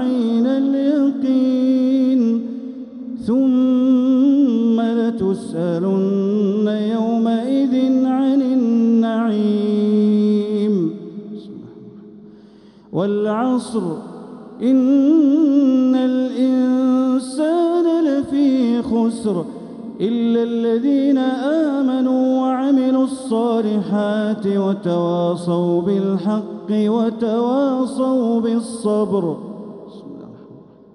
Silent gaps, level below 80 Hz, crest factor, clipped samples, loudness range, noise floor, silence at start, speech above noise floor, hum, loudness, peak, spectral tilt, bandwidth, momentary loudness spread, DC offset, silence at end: none; -62 dBFS; 12 dB; under 0.1%; 4 LU; -45 dBFS; 0 s; 28 dB; none; -17 LUFS; -6 dBFS; -7.5 dB/octave; 11 kHz; 12 LU; under 0.1%; 0.35 s